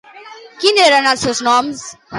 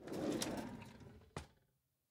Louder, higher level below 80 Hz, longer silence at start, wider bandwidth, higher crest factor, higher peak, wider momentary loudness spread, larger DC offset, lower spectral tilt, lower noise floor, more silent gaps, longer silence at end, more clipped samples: first, -13 LUFS vs -45 LUFS; first, -52 dBFS vs -68 dBFS; first, 0.15 s vs 0 s; second, 11.5 kHz vs 16 kHz; second, 14 dB vs 22 dB; first, 0 dBFS vs -26 dBFS; second, 12 LU vs 18 LU; neither; second, -2 dB/octave vs -4.5 dB/octave; second, -37 dBFS vs -82 dBFS; neither; second, 0 s vs 0.6 s; neither